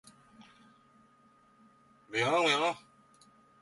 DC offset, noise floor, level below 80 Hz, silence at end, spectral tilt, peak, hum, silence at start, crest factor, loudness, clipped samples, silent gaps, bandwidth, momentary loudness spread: under 0.1%; -64 dBFS; -80 dBFS; 0.85 s; -3 dB/octave; -16 dBFS; none; 0.4 s; 20 dB; -29 LUFS; under 0.1%; none; 11.5 kHz; 11 LU